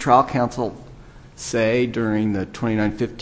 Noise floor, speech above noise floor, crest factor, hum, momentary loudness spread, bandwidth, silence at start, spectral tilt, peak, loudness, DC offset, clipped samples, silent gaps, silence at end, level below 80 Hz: -42 dBFS; 22 dB; 20 dB; none; 11 LU; 8 kHz; 0 s; -6 dB/octave; -2 dBFS; -21 LUFS; under 0.1%; under 0.1%; none; 0 s; -46 dBFS